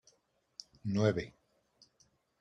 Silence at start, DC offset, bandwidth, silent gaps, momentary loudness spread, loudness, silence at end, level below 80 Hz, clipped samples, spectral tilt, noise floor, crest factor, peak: 0.85 s; under 0.1%; 8.4 kHz; none; 20 LU; -34 LUFS; 1.1 s; -66 dBFS; under 0.1%; -7 dB/octave; -75 dBFS; 22 dB; -18 dBFS